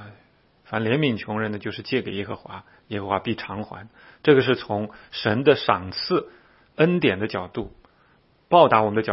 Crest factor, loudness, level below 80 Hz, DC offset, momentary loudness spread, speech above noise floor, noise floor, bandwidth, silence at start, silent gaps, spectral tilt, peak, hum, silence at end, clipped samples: 24 dB; -22 LUFS; -58 dBFS; under 0.1%; 16 LU; 37 dB; -60 dBFS; 5.8 kHz; 0 s; none; -10 dB/octave; 0 dBFS; none; 0 s; under 0.1%